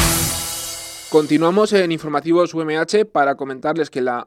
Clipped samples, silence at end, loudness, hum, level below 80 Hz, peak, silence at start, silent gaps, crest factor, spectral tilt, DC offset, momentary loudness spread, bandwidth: under 0.1%; 0 s; -18 LUFS; none; -38 dBFS; -2 dBFS; 0 s; none; 16 dB; -4 dB/octave; under 0.1%; 8 LU; 17 kHz